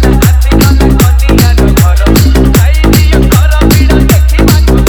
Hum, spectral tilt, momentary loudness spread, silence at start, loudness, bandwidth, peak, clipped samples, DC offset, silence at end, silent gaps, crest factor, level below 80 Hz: none; -6 dB/octave; 1 LU; 0 s; -6 LUFS; over 20 kHz; 0 dBFS; 3%; 0.5%; 0 s; none; 4 dB; -6 dBFS